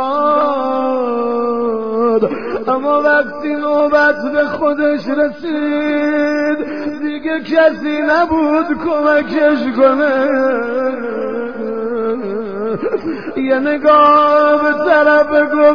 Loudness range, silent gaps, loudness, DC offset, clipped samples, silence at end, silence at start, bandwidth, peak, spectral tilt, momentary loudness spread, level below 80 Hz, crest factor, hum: 4 LU; none; -14 LUFS; 1%; under 0.1%; 0 s; 0 s; 5.4 kHz; 0 dBFS; -6.5 dB/octave; 10 LU; -52 dBFS; 14 dB; none